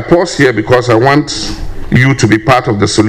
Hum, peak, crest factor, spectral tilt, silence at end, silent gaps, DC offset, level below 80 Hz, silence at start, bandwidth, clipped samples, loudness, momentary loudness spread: none; 0 dBFS; 10 dB; -5.5 dB/octave; 0 s; none; under 0.1%; -28 dBFS; 0 s; 14 kHz; 0.6%; -10 LUFS; 9 LU